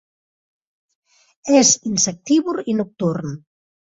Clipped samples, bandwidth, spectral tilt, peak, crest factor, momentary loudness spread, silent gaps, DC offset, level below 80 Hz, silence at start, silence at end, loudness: under 0.1%; 8 kHz; -3.5 dB/octave; -2 dBFS; 18 dB; 18 LU; none; under 0.1%; -62 dBFS; 1.45 s; 0.6 s; -18 LUFS